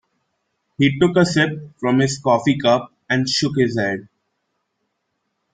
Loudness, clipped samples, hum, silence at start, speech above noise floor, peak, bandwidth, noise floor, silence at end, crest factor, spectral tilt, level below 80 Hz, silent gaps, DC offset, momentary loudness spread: -18 LUFS; under 0.1%; none; 0.8 s; 56 dB; -2 dBFS; 9.4 kHz; -74 dBFS; 1.5 s; 18 dB; -5.5 dB/octave; -56 dBFS; none; under 0.1%; 7 LU